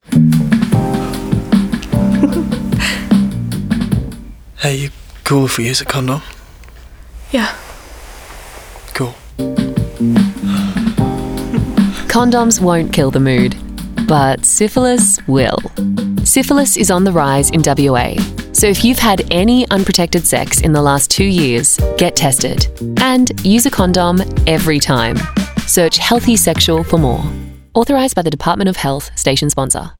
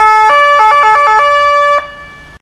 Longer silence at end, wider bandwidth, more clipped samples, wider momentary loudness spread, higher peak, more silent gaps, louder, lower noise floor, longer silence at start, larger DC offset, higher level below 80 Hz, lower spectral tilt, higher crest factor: second, 0.05 s vs 0.25 s; first, over 20 kHz vs 13 kHz; second, under 0.1% vs 0.1%; first, 9 LU vs 6 LU; about the same, 0 dBFS vs 0 dBFS; neither; second, -13 LUFS vs -7 LUFS; first, -36 dBFS vs -31 dBFS; about the same, 0.1 s vs 0 s; neither; first, -28 dBFS vs -44 dBFS; first, -4.5 dB/octave vs -1 dB/octave; about the same, 12 dB vs 8 dB